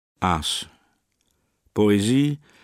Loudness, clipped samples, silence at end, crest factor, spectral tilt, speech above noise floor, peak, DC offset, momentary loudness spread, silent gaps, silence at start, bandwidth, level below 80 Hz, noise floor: -22 LUFS; under 0.1%; 0.25 s; 20 dB; -5 dB/octave; 49 dB; -4 dBFS; under 0.1%; 11 LU; none; 0.2 s; 16 kHz; -48 dBFS; -70 dBFS